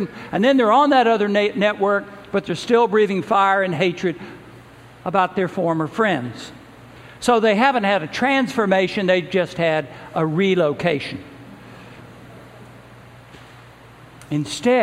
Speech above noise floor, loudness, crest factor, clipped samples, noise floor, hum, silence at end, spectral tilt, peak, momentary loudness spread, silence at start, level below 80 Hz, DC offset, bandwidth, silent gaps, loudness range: 26 dB; -19 LUFS; 18 dB; under 0.1%; -44 dBFS; none; 0 s; -5.5 dB/octave; -2 dBFS; 11 LU; 0 s; -58 dBFS; under 0.1%; 15 kHz; none; 8 LU